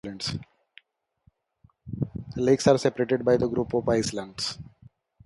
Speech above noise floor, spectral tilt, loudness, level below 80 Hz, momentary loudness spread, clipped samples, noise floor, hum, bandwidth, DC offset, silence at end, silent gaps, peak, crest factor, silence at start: 41 dB; -5.5 dB/octave; -26 LUFS; -52 dBFS; 12 LU; under 0.1%; -66 dBFS; none; 11.5 kHz; under 0.1%; 0.6 s; none; -6 dBFS; 20 dB; 0.05 s